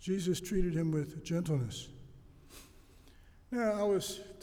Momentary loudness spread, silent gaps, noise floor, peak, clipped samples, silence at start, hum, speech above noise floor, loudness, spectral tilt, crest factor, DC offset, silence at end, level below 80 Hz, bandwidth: 23 LU; none; -58 dBFS; -20 dBFS; under 0.1%; 0 s; none; 25 dB; -35 LUFS; -6 dB/octave; 16 dB; under 0.1%; 0 s; -50 dBFS; 18.5 kHz